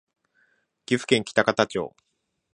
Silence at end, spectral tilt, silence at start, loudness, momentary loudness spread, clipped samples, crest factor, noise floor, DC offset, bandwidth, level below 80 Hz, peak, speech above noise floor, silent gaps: 0.65 s; -4.5 dB/octave; 0.9 s; -24 LUFS; 10 LU; under 0.1%; 24 dB; -67 dBFS; under 0.1%; 11 kHz; -64 dBFS; -2 dBFS; 44 dB; none